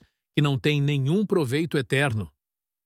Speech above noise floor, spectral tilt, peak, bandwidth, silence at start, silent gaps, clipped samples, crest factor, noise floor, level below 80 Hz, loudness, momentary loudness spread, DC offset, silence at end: 66 dB; -6.5 dB/octave; -8 dBFS; 14.5 kHz; 0.35 s; none; under 0.1%; 16 dB; -89 dBFS; -58 dBFS; -24 LUFS; 6 LU; under 0.1%; 0.55 s